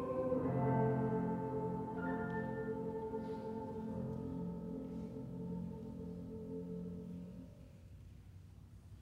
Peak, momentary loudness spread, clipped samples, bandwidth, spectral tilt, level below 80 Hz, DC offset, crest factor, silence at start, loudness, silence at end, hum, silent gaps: -24 dBFS; 22 LU; under 0.1%; 9 kHz; -10 dB/octave; -62 dBFS; under 0.1%; 18 dB; 0 s; -41 LUFS; 0 s; none; none